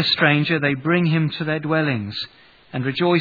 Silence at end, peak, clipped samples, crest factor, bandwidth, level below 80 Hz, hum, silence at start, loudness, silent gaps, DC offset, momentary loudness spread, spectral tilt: 0 s; 0 dBFS; under 0.1%; 20 dB; 4.9 kHz; -62 dBFS; none; 0 s; -20 LUFS; none; under 0.1%; 13 LU; -8 dB/octave